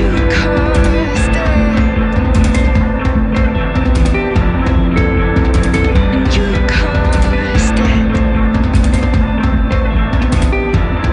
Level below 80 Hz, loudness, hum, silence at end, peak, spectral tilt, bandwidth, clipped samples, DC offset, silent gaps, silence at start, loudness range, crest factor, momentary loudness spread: -14 dBFS; -13 LUFS; none; 0 s; 0 dBFS; -6.5 dB/octave; 10.5 kHz; under 0.1%; under 0.1%; none; 0 s; 1 LU; 10 dB; 2 LU